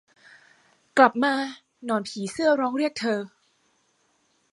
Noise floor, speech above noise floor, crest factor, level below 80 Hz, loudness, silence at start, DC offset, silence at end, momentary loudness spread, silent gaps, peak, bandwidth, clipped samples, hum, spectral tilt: -68 dBFS; 45 dB; 24 dB; -74 dBFS; -24 LUFS; 0.95 s; under 0.1%; 1.25 s; 14 LU; none; -2 dBFS; 11.5 kHz; under 0.1%; none; -4.5 dB/octave